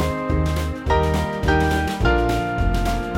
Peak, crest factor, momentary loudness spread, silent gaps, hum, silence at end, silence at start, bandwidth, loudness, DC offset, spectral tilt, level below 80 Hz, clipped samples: -4 dBFS; 16 dB; 4 LU; none; none; 0 s; 0 s; 17 kHz; -21 LUFS; under 0.1%; -6.5 dB/octave; -24 dBFS; under 0.1%